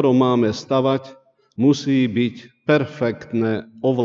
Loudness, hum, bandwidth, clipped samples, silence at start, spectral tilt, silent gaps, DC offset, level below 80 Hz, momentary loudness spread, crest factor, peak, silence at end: -20 LUFS; none; 7.4 kHz; under 0.1%; 0 s; -7 dB/octave; none; under 0.1%; -62 dBFS; 8 LU; 16 dB; -4 dBFS; 0 s